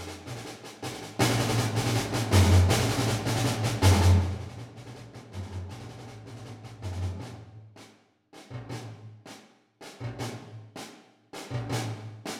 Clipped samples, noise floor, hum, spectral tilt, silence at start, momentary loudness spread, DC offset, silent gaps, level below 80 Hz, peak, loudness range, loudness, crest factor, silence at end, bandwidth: under 0.1%; -58 dBFS; none; -5 dB/octave; 0 s; 23 LU; under 0.1%; none; -46 dBFS; -8 dBFS; 18 LU; -27 LUFS; 22 dB; 0 s; 16 kHz